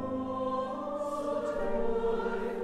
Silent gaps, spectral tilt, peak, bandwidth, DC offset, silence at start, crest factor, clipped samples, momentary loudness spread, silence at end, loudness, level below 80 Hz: none; -6.5 dB/octave; -20 dBFS; 11.5 kHz; under 0.1%; 0 s; 12 dB; under 0.1%; 4 LU; 0 s; -33 LUFS; -46 dBFS